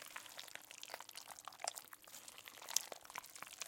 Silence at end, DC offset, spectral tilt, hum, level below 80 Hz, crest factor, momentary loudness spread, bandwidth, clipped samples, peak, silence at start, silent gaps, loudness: 0 s; under 0.1%; 1.5 dB/octave; none; -90 dBFS; 38 dB; 13 LU; 17 kHz; under 0.1%; -12 dBFS; 0 s; none; -48 LUFS